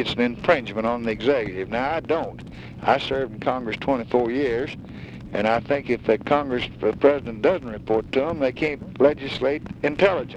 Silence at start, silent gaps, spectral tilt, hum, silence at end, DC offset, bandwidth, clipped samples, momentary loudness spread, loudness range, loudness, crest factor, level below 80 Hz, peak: 0 s; none; -6.5 dB/octave; none; 0 s; under 0.1%; 8.6 kHz; under 0.1%; 7 LU; 2 LU; -23 LUFS; 18 dB; -48 dBFS; -4 dBFS